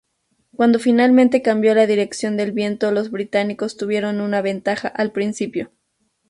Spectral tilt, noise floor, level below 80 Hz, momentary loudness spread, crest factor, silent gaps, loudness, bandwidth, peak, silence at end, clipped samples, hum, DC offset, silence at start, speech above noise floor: -5.5 dB/octave; -69 dBFS; -64 dBFS; 11 LU; 16 dB; none; -18 LUFS; 11.5 kHz; -4 dBFS; 0.65 s; under 0.1%; none; under 0.1%; 0.6 s; 51 dB